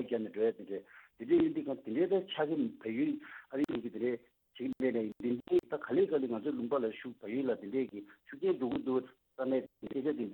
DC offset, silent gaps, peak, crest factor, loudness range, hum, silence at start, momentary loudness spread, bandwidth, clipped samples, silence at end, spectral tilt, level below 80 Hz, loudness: under 0.1%; none; -18 dBFS; 16 dB; 2 LU; none; 0 s; 11 LU; 18.5 kHz; under 0.1%; 0 s; -8 dB/octave; -74 dBFS; -35 LUFS